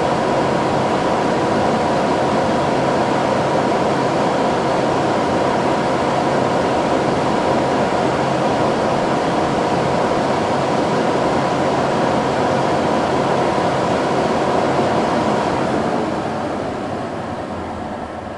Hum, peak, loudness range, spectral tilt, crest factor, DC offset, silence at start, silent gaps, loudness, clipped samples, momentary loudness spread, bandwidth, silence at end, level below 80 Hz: none; -4 dBFS; 1 LU; -5.5 dB/octave; 14 dB; under 0.1%; 0 s; none; -18 LUFS; under 0.1%; 5 LU; 11.5 kHz; 0 s; -46 dBFS